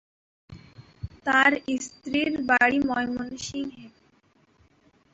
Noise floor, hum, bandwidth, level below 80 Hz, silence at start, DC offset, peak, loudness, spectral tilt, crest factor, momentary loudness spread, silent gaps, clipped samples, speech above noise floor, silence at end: -63 dBFS; none; 8.2 kHz; -56 dBFS; 0.5 s; under 0.1%; -6 dBFS; -24 LUFS; -3.5 dB/octave; 22 dB; 15 LU; none; under 0.1%; 39 dB; 1.25 s